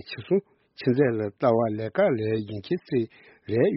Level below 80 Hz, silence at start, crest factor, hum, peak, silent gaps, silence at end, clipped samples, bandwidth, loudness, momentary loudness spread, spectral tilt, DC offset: -64 dBFS; 0.05 s; 16 dB; none; -8 dBFS; none; 0 s; under 0.1%; 5.8 kHz; -26 LUFS; 8 LU; -6.5 dB/octave; under 0.1%